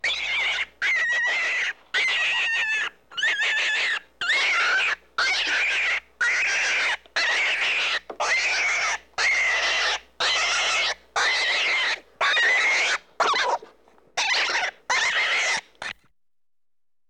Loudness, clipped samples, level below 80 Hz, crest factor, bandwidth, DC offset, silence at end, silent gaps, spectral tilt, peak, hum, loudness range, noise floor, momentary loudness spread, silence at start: -22 LUFS; under 0.1%; -62 dBFS; 14 dB; 15 kHz; under 0.1%; 1.15 s; none; 1.5 dB/octave; -10 dBFS; none; 2 LU; under -90 dBFS; 6 LU; 0.05 s